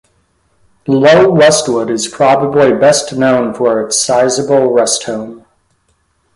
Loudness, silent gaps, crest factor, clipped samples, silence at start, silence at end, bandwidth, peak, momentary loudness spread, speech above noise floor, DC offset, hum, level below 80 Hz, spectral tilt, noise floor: -10 LUFS; none; 12 dB; under 0.1%; 0.85 s; 0.95 s; 11.5 kHz; 0 dBFS; 9 LU; 49 dB; under 0.1%; none; -52 dBFS; -4 dB/octave; -59 dBFS